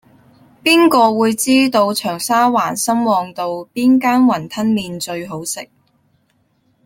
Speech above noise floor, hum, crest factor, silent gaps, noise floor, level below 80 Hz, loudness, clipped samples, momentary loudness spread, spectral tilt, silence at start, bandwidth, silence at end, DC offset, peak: 46 dB; none; 16 dB; none; -61 dBFS; -60 dBFS; -15 LUFS; under 0.1%; 12 LU; -3.5 dB/octave; 0.65 s; 17 kHz; 1.2 s; under 0.1%; 0 dBFS